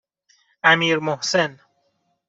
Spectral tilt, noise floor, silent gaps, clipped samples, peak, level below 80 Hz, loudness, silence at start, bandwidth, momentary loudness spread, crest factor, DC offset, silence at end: -3.5 dB/octave; -69 dBFS; none; under 0.1%; -2 dBFS; -68 dBFS; -19 LUFS; 0.65 s; 8 kHz; 6 LU; 20 dB; under 0.1%; 0.75 s